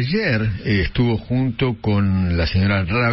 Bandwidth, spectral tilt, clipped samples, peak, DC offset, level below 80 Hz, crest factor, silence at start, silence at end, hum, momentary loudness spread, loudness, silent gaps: 5.8 kHz; -11.5 dB/octave; under 0.1%; -8 dBFS; under 0.1%; -32 dBFS; 10 dB; 0 s; 0 s; none; 3 LU; -19 LUFS; none